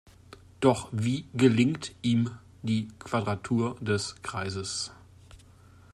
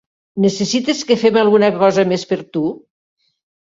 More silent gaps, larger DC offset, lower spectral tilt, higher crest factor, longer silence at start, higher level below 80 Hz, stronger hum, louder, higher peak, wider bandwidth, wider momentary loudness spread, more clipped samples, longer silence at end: neither; neither; about the same, -5.5 dB/octave vs -5 dB/octave; first, 22 dB vs 14 dB; first, 0.6 s vs 0.35 s; about the same, -60 dBFS vs -60 dBFS; neither; second, -29 LUFS vs -15 LUFS; second, -8 dBFS vs -2 dBFS; first, 12 kHz vs 7.8 kHz; about the same, 10 LU vs 10 LU; neither; second, 0.55 s vs 1 s